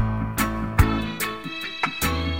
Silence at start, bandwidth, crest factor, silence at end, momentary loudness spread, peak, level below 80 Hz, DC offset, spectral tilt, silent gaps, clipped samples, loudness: 0 s; 16.5 kHz; 20 dB; 0 s; 7 LU; -4 dBFS; -32 dBFS; under 0.1%; -5 dB/octave; none; under 0.1%; -25 LUFS